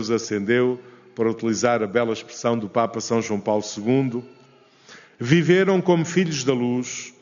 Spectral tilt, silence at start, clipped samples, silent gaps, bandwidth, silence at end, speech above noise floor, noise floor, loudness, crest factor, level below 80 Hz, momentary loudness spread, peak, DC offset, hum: -5.5 dB/octave; 0 s; under 0.1%; none; 7.4 kHz; 0.1 s; 32 dB; -53 dBFS; -22 LUFS; 18 dB; -66 dBFS; 9 LU; -4 dBFS; under 0.1%; none